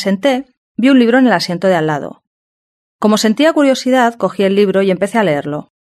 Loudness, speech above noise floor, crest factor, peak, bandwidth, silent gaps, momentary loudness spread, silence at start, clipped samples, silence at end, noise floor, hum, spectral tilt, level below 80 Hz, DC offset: -13 LUFS; over 78 dB; 14 dB; 0 dBFS; 13.5 kHz; 0.57-0.75 s, 2.27-2.99 s; 10 LU; 0 s; under 0.1%; 0.3 s; under -90 dBFS; none; -5.5 dB/octave; -60 dBFS; under 0.1%